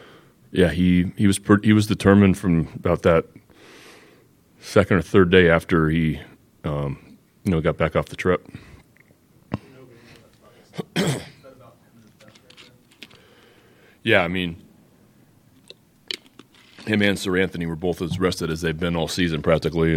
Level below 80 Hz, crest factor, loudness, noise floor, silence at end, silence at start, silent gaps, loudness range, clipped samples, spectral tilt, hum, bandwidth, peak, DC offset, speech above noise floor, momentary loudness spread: -44 dBFS; 22 dB; -21 LUFS; -56 dBFS; 0 s; 0.55 s; none; 13 LU; under 0.1%; -6 dB/octave; none; 16 kHz; 0 dBFS; under 0.1%; 36 dB; 17 LU